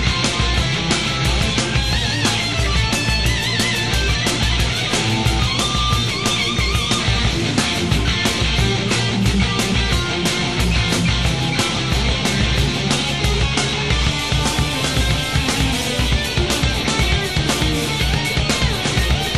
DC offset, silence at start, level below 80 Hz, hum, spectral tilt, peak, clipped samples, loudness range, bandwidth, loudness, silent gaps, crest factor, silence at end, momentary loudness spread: 0.8%; 0 s; -24 dBFS; none; -3.5 dB/octave; -2 dBFS; under 0.1%; 1 LU; 13 kHz; -18 LUFS; none; 16 dB; 0 s; 1 LU